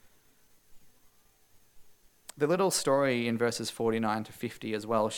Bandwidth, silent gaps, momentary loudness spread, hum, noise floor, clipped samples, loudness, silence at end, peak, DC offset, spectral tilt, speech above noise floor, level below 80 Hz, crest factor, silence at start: 18 kHz; none; 12 LU; none; -62 dBFS; under 0.1%; -30 LUFS; 0 s; -14 dBFS; under 0.1%; -4 dB/octave; 33 dB; -68 dBFS; 18 dB; 0.7 s